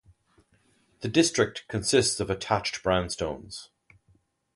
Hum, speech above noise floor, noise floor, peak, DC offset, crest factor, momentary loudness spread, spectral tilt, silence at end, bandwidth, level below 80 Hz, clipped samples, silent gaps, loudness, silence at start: none; 40 dB; -66 dBFS; -8 dBFS; under 0.1%; 20 dB; 14 LU; -3.5 dB/octave; 0.9 s; 11.5 kHz; -50 dBFS; under 0.1%; none; -26 LUFS; 1 s